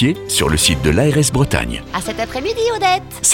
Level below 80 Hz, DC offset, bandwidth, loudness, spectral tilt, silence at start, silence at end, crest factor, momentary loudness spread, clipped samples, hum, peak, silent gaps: -30 dBFS; under 0.1%; 19.5 kHz; -16 LUFS; -3.5 dB/octave; 0 s; 0 s; 16 dB; 9 LU; under 0.1%; none; 0 dBFS; none